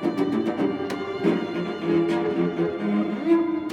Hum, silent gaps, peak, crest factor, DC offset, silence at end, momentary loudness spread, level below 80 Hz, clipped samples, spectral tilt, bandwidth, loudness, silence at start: none; none; -10 dBFS; 14 dB; under 0.1%; 0 s; 5 LU; -64 dBFS; under 0.1%; -7.5 dB/octave; 9 kHz; -24 LUFS; 0 s